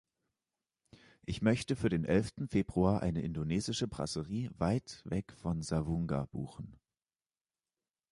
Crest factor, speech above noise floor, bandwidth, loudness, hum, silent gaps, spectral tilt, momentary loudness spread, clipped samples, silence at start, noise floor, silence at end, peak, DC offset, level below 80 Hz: 20 dB; over 56 dB; 11.5 kHz; -35 LUFS; none; none; -6.5 dB/octave; 11 LU; under 0.1%; 1.3 s; under -90 dBFS; 1.35 s; -16 dBFS; under 0.1%; -52 dBFS